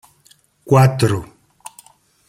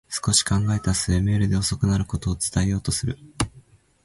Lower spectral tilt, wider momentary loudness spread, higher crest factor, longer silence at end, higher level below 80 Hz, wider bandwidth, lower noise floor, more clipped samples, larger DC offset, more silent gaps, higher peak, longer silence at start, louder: first, -6.5 dB/octave vs -4.5 dB/octave; first, 25 LU vs 9 LU; about the same, 18 dB vs 18 dB; first, 1.05 s vs 0.45 s; second, -50 dBFS vs -36 dBFS; first, 15.5 kHz vs 11.5 kHz; about the same, -54 dBFS vs -53 dBFS; neither; neither; neither; about the same, -2 dBFS vs -4 dBFS; first, 0.65 s vs 0.1 s; first, -16 LUFS vs -23 LUFS